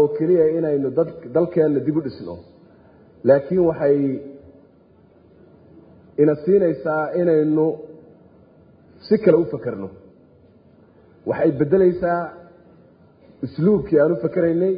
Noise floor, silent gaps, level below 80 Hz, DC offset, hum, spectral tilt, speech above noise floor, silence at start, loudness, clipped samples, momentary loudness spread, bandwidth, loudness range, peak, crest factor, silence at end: -52 dBFS; none; -54 dBFS; under 0.1%; none; -13 dB/octave; 34 dB; 0 s; -19 LUFS; under 0.1%; 16 LU; 5.2 kHz; 3 LU; -2 dBFS; 18 dB; 0 s